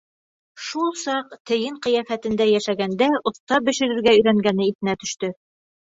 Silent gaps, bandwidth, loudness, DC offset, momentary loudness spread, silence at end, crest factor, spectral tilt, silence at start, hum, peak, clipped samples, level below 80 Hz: 1.40-1.45 s, 3.40-3.47 s, 4.75-4.79 s; 8 kHz; -21 LUFS; under 0.1%; 11 LU; 0.5 s; 18 dB; -4.5 dB/octave; 0.55 s; none; -4 dBFS; under 0.1%; -60 dBFS